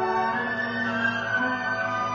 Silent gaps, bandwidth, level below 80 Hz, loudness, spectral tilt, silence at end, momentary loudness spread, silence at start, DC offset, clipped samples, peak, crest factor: none; 7.4 kHz; -60 dBFS; -25 LUFS; -5 dB/octave; 0 s; 2 LU; 0 s; under 0.1%; under 0.1%; -12 dBFS; 14 dB